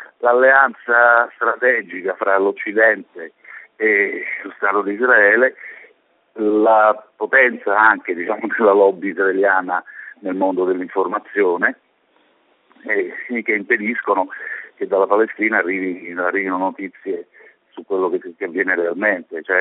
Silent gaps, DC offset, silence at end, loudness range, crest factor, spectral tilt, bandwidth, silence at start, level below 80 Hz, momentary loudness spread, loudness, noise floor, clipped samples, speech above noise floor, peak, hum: none; under 0.1%; 0 s; 6 LU; 18 dB; -3 dB/octave; 4 kHz; 0 s; -72 dBFS; 13 LU; -17 LUFS; -59 dBFS; under 0.1%; 42 dB; 0 dBFS; none